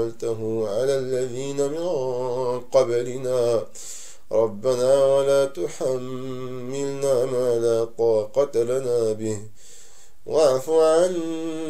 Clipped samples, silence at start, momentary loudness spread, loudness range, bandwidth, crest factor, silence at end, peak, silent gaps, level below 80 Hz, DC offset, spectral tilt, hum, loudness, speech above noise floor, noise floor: under 0.1%; 0 s; 11 LU; 2 LU; 15.5 kHz; 16 dB; 0 s; -6 dBFS; none; -62 dBFS; 2%; -5.5 dB/octave; none; -23 LUFS; 29 dB; -51 dBFS